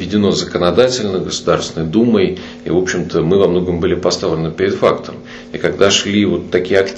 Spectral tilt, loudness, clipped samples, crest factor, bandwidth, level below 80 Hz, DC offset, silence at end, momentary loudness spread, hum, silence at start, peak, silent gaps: -5 dB/octave; -15 LUFS; under 0.1%; 14 dB; 8.4 kHz; -42 dBFS; under 0.1%; 0 s; 7 LU; none; 0 s; 0 dBFS; none